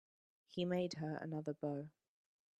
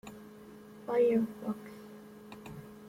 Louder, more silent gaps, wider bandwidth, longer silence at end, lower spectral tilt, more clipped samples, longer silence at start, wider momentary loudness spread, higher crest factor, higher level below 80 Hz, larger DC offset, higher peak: second, -43 LUFS vs -32 LUFS; neither; second, 12.5 kHz vs 16.5 kHz; first, 0.7 s vs 0 s; about the same, -6.5 dB/octave vs -7.5 dB/octave; neither; first, 0.5 s vs 0.05 s; second, 10 LU vs 23 LU; about the same, 18 dB vs 18 dB; second, -82 dBFS vs -70 dBFS; neither; second, -28 dBFS vs -18 dBFS